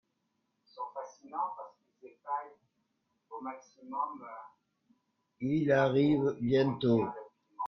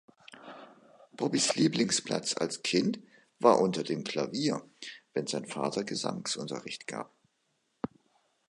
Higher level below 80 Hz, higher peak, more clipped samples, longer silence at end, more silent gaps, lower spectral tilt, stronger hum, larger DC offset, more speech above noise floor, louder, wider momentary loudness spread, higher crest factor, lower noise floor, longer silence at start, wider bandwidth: about the same, -70 dBFS vs -74 dBFS; second, -16 dBFS vs -8 dBFS; neither; second, 0 s vs 1.45 s; neither; first, -8 dB/octave vs -4 dB/octave; neither; neither; about the same, 49 dB vs 46 dB; about the same, -32 LUFS vs -30 LUFS; first, 22 LU vs 19 LU; second, 18 dB vs 24 dB; first, -80 dBFS vs -76 dBFS; first, 0.75 s vs 0.3 s; second, 6.6 kHz vs 11.5 kHz